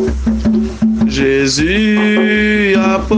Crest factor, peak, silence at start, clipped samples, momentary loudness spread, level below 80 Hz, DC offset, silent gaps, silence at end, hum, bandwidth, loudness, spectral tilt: 12 dB; 0 dBFS; 0 s; under 0.1%; 4 LU; -26 dBFS; under 0.1%; none; 0 s; none; 9.6 kHz; -12 LUFS; -5 dB/octave